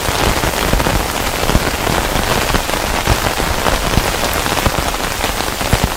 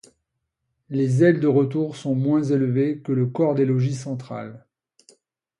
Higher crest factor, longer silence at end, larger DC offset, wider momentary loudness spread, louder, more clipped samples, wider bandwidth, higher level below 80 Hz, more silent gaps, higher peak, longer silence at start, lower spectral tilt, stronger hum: about the same, 16 dB vs 18 dB; second, 0 s vs 1 s; neither; second, 3 LU vs 13 LU; first, -15 LUFS vs -21 LUFS; first, 0.2% vs under 0.1%; first, over 20 kHz vs 11 kHz; first, -22 dBFS vs -66 dBFS; neither; first, 0 dBFS vs -4 dBFS; second, 0 s vs 0.9 s; second, -3.5 dB/octave vs -8.5 dB/octave; neither